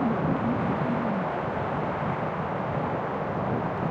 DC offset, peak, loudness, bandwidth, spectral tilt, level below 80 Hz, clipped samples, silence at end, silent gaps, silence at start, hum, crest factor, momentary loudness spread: under 0.1%; -14 dBFS; -28 LUFS; 7.6 kHz; -9 dB/octave; -52 dBFS; under 0.1%; 0 s; none; 0 s; none; 14 dB; 3 LU